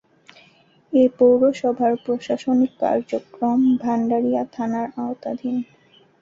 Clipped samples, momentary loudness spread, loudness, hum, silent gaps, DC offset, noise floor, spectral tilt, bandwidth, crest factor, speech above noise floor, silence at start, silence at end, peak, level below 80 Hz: under 0.1%; 12 LU; -21 LUFS; none; none; under 0.1%; -55 dBFS; -7 dB/octave; 7.4 kHz; 16 dB; 36 dB; 0.9 s; 0.6 s; -6 dBFS; -64 dBFS